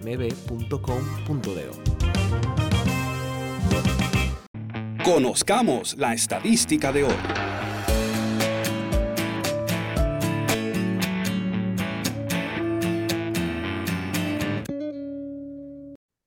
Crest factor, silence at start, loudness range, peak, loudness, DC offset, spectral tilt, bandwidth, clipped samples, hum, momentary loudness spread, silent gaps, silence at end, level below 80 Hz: 16 dB; 0 s; 4 LU; -8 dBFS; -25 LUFS; under 0.1%; -5 dB/octave; 17.5 kHz; under 0.1%; none; 11 LU; 4.47-4.54 s; 0.3 s; -36 dBFS